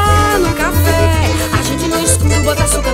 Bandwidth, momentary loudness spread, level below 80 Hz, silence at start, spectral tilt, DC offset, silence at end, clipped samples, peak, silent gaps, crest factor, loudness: 16.5 kHz; 4 LU; -22 dBFS; 0 s; -4.5 dB/octave; under 0.1%; 0 s; under 0.1%; 0 dBFS; none; 12 dB; -13 LUFS